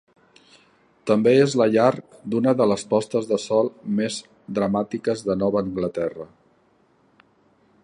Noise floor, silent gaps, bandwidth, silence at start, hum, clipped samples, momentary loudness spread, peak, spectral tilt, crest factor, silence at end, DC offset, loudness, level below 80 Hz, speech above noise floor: -61 dBFS; none; 11 kHz; 1.05 s; none; under 0.1%; 12 LU; -4 dBFS; -6 dB/octave; 20 dB; 1.6 s; under 0.1%; -22 LUFS; -60 dBFS; 40 dB